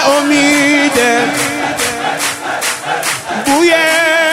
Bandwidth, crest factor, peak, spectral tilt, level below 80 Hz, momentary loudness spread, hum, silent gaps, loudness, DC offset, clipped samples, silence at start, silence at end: 16 kHz; 12 dB; 0 dBFS; -2 dB/octave; -52 dBFS; 7 LU; none; none; -12 LUFS; under 0.1%; under 0.1%; 0 s; 0 s